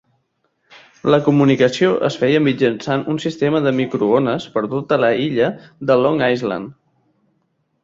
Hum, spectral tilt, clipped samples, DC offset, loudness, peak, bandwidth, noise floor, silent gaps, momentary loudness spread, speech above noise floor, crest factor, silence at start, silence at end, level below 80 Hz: none; -7 dB/octave; under 0.1%; under 0.1%; -17 LUFS; -2 dBFS; 7.8 kHz; -67 dBFS; none; 8 LU; 51 dB; 16 dB; 1.05 s; 1.1 s; -58 dBFS